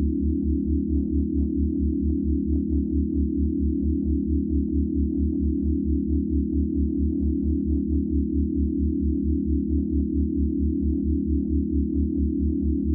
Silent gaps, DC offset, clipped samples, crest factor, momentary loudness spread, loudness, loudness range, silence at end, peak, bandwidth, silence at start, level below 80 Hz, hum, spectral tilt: none; under 0.1%; under 0.1%; 10 dB; 0 LU; -25 LUFS; 0 LU; 0 s; -12 dBFS; 0.7 kHz; 0 s; -28 dBFS; none; -19 dB/octave